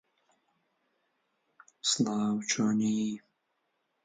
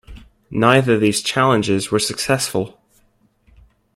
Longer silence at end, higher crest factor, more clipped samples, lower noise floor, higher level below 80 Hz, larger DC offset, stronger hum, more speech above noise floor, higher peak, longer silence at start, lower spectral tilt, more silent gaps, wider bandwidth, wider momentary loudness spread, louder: second, 0.85 s vs 1.25 s; about the same, 20 dB vs 18 dB; neither; first, -79 dBFS vs -59 dBFS; second, -76 dBFS vs -48 dBFS; neither; neither; first, 50 dB vs 42 dB; second, -14 dBFS vs 0 dBFS; first, 1.85 s vs 0.1 s; about the same, -3.5 dB/octave vs -4.5 dB/octave; neither; second, 9.6 kHz vs 16 kHz; second, 6 LU vs 10 LU; second, -30 LUFS vs -17 LUFS